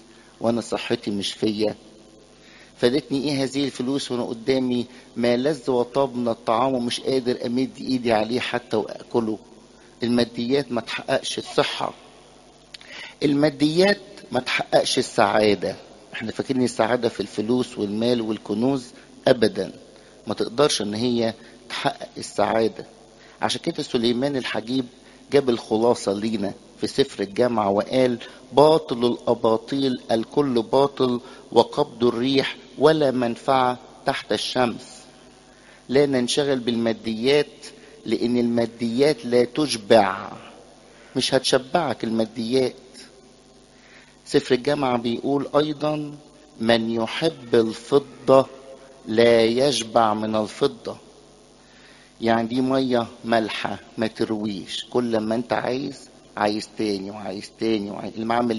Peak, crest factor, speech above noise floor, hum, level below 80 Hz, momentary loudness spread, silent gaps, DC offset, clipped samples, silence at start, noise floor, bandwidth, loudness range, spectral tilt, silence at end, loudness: 0 dBFS; 22 dB; 29 dB; none; -58 dBFS; 11 LU; none; under 0.1%; under 0.1%; 0.4 s; -51 dBFS; 11.5 kHz; 4 LU; -5 dB/octave; 0 s; -23 LUFS